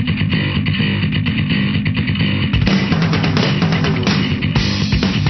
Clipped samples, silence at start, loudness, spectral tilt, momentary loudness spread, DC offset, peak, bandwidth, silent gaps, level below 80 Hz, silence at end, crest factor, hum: under 0.1%; 0 s; -16 LUFS; -6.5 dB/octave; 2 LU; 0.1%; -2 dBFS; 6.4 kHz; none; -30 dBFS; 0 s; 14 dB; none